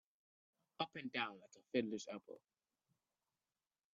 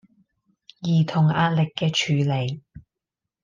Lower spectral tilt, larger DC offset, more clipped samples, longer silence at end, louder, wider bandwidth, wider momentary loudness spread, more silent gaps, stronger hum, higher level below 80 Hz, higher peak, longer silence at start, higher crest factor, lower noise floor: second, -2.5 dB/octave vs -6 dB/octave; neither; neither; first, 1.6 s vs 0.65 s; second, -45 LUFS vs -22 LUFS; about the same, 7.4 kHz vs 7.4 kHz; first, 19 LU vs 11 LU; neither; neither; second, -90 dBFS vs -60 dBFS; second, -24 dBFS vs -8 dBFS; about the same, 0.8 s vs 0.8 s; first, 24 dB vs 16 dB; first, under -90 dBFS vs -86 dBFS